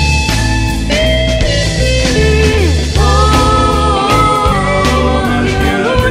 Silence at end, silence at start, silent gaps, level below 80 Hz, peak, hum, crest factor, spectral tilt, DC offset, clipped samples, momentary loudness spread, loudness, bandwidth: 0 s; 0 s; none; -16 dBFS; 0 dBFS; none; 10 dB; -5 dB/octave; under 0.1%; under 0.1%; 3 LU; -11 LUFS; 15 kHz